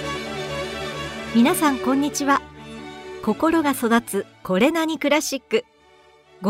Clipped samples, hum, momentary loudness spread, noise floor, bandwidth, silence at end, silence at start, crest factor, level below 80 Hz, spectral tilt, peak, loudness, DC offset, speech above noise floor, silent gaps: under 0.1%; none; 11 LU; -53 dBFS; 16 kHz; 0 s; 0 s; 18 dB; -50 dBFS; -4 dB/octave; -4 dBFS; -22 LUFS; under 0.1%; 33 dB; none